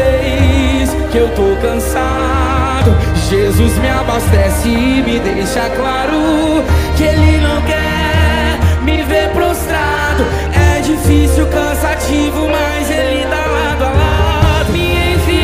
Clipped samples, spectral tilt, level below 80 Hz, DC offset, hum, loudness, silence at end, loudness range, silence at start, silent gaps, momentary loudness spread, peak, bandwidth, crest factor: under 0.1%; -5.5 dB/octave; -18 dBFS; under 0.1%; none; -13 LUFS; 0 s; 1 LU; 0 s; none; 3 LU; 0 dBFS; 16 kHz; 12 dB